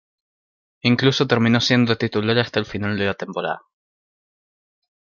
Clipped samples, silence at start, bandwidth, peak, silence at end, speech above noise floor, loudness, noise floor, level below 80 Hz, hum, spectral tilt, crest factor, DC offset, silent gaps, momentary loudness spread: under 0.1%; 0.85 s; 7.2 kHz; -2 dBFS; 1.6 s; over 71 dB; -20 LUFS; under -90 dBFS; -58 dBFS; none; -5.5 dB/octave; 20 dB; under 0.1%; none; 10 LU